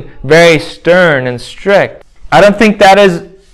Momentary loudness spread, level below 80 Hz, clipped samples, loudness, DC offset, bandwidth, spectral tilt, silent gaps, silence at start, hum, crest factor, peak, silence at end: 13 LU; -38 dBFS; 4%; -7 LUFS; under 0.1%; 16 kHz; -5 dB/octave; none; 0 s; none; 8 dB; 0 dBFS; 0.3 s